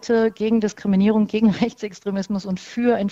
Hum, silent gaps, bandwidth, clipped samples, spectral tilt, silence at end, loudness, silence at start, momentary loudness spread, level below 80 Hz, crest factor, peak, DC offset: none; none; 7.8 kHz; under 0.1%; -7 dB/octave; 0 s; -21 LUFS; 0.05 s; 9 LU; -54 dBFS; 16 dB; -4 dBFS; under 0.1%